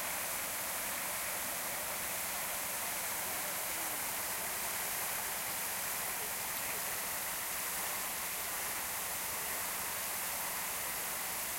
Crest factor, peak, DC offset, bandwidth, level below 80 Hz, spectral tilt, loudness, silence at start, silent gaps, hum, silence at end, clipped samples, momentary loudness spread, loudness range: 16 dB; -24 dBFS; under 0.1%; 16.5 kHz; -66 dBFS; 0 dB/octave; -35 LUFS; 0 s; none; none; 0 s; under 0.1%; 1 LU; 0 LU